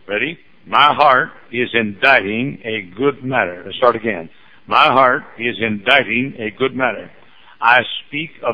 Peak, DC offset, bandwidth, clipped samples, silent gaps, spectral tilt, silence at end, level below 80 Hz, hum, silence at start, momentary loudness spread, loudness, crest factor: 0 dBFS; 0.6%; 5.4 kHz; under 0.1%; none; -7 dB/octave; 0 s; -58 dBFS; none; 0.1 s; 11 LU; -16 LUFS; 16 dB